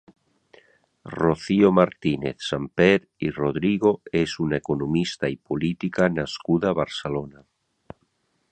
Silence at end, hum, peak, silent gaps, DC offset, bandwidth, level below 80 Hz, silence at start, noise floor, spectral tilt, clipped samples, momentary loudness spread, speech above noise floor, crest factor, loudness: 1.2 s; none; -2 dBFS; none; under 0.1%; 9 kHz; -52 dBFS; 1.05 s; -70 dBFS; -6.5 dB/octave; under 0.1%; 10 LU; 47 dB; 22 dB; -23 LUFS